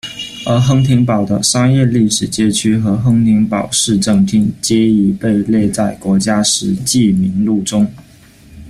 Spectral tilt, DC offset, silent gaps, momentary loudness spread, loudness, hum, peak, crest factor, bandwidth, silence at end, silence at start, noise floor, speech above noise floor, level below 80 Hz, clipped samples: -5 dB/octave; under 0.1%; none; 4 LU; -13 LUFS; none; 0 dBFS; 12 dB; 15 kHz; 0 s; 0.05 s; -41 dBFS; 29 dB; -42 dBFS; under 0.1%